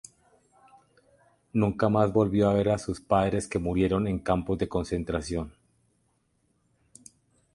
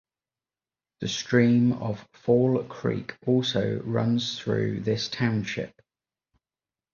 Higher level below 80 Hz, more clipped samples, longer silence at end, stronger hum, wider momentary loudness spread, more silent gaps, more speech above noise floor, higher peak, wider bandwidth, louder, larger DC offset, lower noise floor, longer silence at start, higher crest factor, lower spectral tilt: first, -46 dBFS vs -60 dBFS; neither; first, 2.05 s vs 1.25 s; neither; second, 8 LU vs 11 LU; neither; second, 46 dB vs over 65 dB; about the same, -8 dBFS vs -8 dBFS; first, 11.5 kHz vs 7.2 kHz; about the same, -27 LUFS vs -26 LUFS; neither; second, -71 dBFS vs under -90 dBFS; first, 1.55 s vs 1 s; about the same, 20 dB vs 18 dB; about the same, -7 dB/octave vs -6 dB/octave